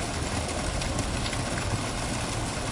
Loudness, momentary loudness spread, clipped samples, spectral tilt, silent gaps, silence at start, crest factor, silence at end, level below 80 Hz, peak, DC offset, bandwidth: -30 LUFS; 1 LU; under 0.1%; -4 dB/octave; none; 0 s; 14 dB; 0 s; -38 dBFS; -16 dBFS; under 0.1%; 11.5 kHz